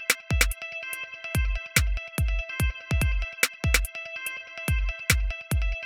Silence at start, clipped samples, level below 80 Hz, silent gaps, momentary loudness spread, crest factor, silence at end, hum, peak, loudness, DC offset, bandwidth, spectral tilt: 0 s; under 0.1%; -30 dBFS; none; 8 LU; 22 dB; 0 s; none; -6 dBFS; -27 LUFS; under 0.1%; over 20 kHz; -3 dB/octave